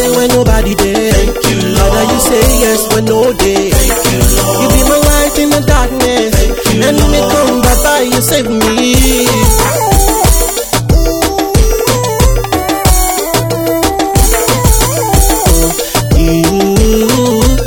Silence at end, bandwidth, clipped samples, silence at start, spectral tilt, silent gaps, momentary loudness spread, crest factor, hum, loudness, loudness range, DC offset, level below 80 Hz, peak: 0 s; 19.5 kHz; 0.3%; 0 s; -4 dB/octave; none; 3 LU; 8 dB; none; -9 LUFS; 2 LU; under 0.1%; -14 dBFS; 0 dBFS